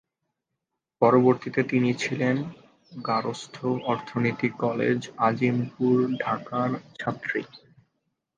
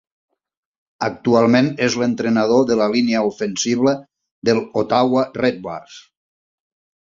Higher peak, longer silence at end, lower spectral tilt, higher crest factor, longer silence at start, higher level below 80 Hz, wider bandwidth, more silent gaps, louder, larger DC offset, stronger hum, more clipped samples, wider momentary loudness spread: second, -6 dBFS vs -2 dBFS; second, 0.8 s vs 1 s; first, -7 dB/octave vs -5 dB/octave; about the same, 22 dB vs 18 dB; about the same, 1 s vs 1 s; second, -68 dBFS vs -58 dBFS; first, 9 kHz vs 7.6 kHz; second, none vs 4.31-4.42 s; second, -25 LUFS vs -18 LUFS; neither; neither; neither; about the same, 11 LU vs 10 LU